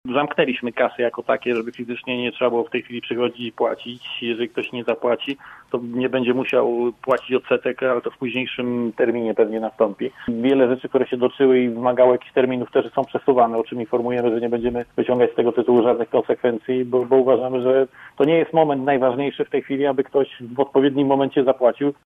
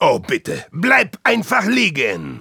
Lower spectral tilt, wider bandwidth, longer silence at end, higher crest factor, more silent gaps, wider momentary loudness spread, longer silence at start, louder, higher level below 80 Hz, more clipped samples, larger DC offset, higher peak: first, -8 dB/octave vs -4.5 dB/octave; second, 4 kHz vs 19 kHz; first, 0.15 s vs 0 s; about the same, 18 dB vs 16 dB; neither; about the same, 8 LU vs 8 LU; about the same, 0.05 s vs 0 s; second, -20 LUFS vs -16 LUFS; about the same, -60 dBFS vs -56 dBFS; neither; neither; about the same, -2 dBFS vs -2 dBFS